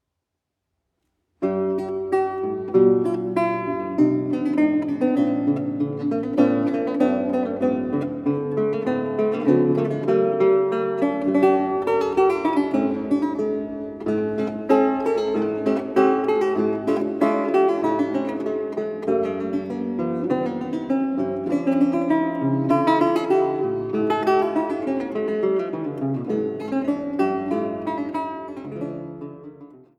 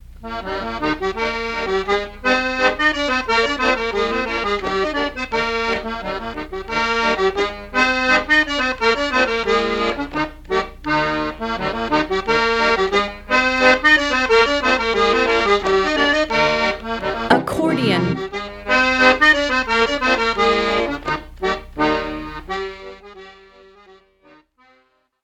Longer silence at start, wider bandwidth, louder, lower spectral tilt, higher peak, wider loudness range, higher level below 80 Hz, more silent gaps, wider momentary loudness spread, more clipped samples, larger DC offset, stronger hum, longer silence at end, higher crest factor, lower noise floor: first, 1.4 s vs 0.1 s; second, 10.5 kHz vs 15.5 kHz; second, -22 LUFS vs -18 LUFS; first, -8.5 dB/octave vs -4 dB/octave; second, -4 dBFS vs 0 dBFS; about the same, 4 LU vs 6 LU; second, -62 dBFS vs -38 dBFS; neither; second, 8 LU vs 11 LU; neither; neither; neither; second, 0.2 s vs 1.9 s; about the same, 16 dB vs 18 dB; first, -81 dBFS vs -60 dBFS